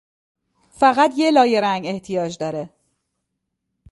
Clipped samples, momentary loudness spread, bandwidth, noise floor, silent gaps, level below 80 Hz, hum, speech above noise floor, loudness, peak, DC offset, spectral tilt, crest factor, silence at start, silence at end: under 0.1%; 12 LU; 11.5 kHz; -77 dBFS; none; -60 dBFS; none; 59 dB; -18 LUFS; -2 dBFS; under 0.1%; -5 dB/octave; 20 dB; 0.8 s; 1.25 s